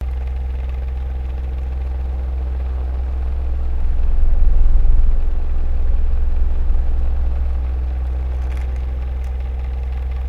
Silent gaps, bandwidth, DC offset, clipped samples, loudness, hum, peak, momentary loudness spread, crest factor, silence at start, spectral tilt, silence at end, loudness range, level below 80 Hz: none; 3 kHz; under 0.1%; under 0.1%; -23 LUFS; none; -2 dBFS; 5 LU; 14 dB; 0 s; -9 dB/octave; 0 s; 3 LU; -16 dBFS